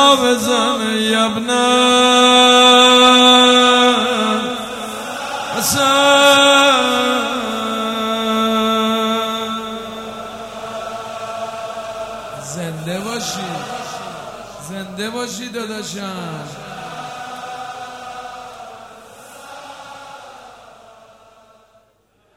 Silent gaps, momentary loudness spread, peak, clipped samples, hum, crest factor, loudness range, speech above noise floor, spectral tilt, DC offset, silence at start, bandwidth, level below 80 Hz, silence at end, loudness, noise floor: none; 23 LU; 0 dBFS; under 0.1%; none; 16 dB; 21 LU; 44 dB; -2.5 dB/octave; under 0.1%; 0 s; 16.5 kHz; -56 dBFS; 1.85 s; -13 LUFS; -59 dBFS